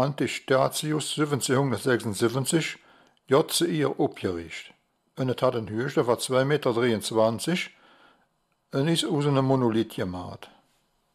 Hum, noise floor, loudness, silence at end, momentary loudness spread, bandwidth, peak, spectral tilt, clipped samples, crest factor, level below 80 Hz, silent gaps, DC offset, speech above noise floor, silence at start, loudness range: none; -71 dBFS; -26 LUFS; 0.7 s; 10 LU; 15.5 kHz; -8 dBFS; -5 dB/octave; under 0.1%; 18 dB; -64 dBFS; none; under 0.1%; 46 dB; 0 s; 2 LU